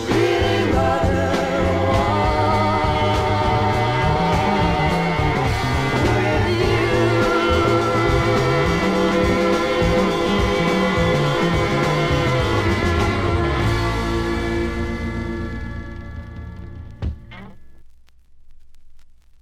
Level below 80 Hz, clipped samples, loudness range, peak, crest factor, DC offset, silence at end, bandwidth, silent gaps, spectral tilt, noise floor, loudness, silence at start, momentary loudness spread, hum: -30 dBFS; under 0.1%; 12 LU; -4 dBFS; 16 dB; under 0.1%; 0.35 s; 15 kHz; none; -6 dB/octave; -45 dBFS; -19 LUFS; 0 s; 12 LU; none